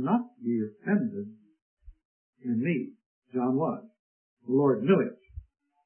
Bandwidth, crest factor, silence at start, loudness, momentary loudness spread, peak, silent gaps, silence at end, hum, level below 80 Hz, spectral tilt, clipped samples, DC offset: 3.3 kHz; 18 dB; 0 s; -29 LUFS; 19 LU; -10 dBFS; 1.62-1.77 s, 2.05-2.33 s, 3.06-3.22 s, 3.99-4.37 s; 0.45 s; none; -58 dBFS; -12 dB/octave; under 0.1%; under 0.1%